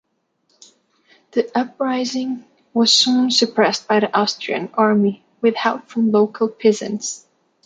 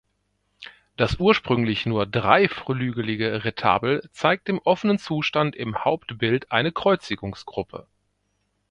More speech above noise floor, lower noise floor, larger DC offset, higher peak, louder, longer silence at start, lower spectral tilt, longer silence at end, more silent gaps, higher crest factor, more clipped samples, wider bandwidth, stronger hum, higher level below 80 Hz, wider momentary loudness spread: about the same, 49 dB vs 49 dB; second, -67 dBFS vs -72 dBFS; neither; about the same, -2 dBFS vs 0 dBFS; first, -18 LUFS vs -23 LUFS; first, 1.35 s vs 0.6 s; second, -3.5 dB/octave vs -6.5 dB/octave; second, 0.5 s vs 0.9 s; neither; second, 18 dB vs 24 dB; neither; about the same, 9.4 kHz vs 10 kHz; second, none vs 50 Hz at -50 dBFS; second, -70 dBFS vs -50 dBFS; about the same, 11 LU vs 13 LU